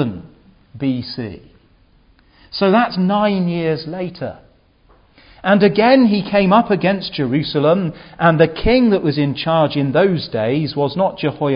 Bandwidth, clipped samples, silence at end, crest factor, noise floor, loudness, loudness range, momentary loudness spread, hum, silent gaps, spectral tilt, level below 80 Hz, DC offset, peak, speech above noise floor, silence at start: 5.4 kHz; under 0.1%; 0 s; 16 dB; -52 dBFS; -16 LUFS; 5 LU; 13 LU; none; none; -11 dB/octave; -42 dBFS; under 0.1%; 0 dBFS; 37 dB; 0 s